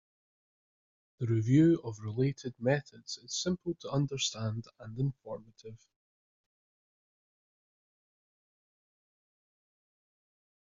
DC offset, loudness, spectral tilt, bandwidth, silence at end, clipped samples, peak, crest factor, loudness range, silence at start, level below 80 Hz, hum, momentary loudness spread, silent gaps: under 0.1%; -32 LUFS; -6.5 dB/octave; 7.6 kHz; 4.9 s; under 0.1%; -14 dBFS; 22 dB; 13 LU; 1.2 s; -66 dBFS; none; 19 LU; none